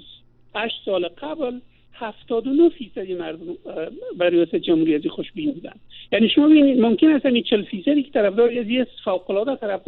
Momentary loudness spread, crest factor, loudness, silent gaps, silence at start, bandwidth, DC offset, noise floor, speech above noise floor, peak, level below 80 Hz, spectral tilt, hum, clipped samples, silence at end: 16 LU; 14 dB; -20 LUFS; none; 0.1 s; 4.2 kHz; under 0.1%; -48 dBFS; 29 dB; -6 dBFS; -58 dBFS; -3.5 dB/octave; none; under 0.1%; 0.1 s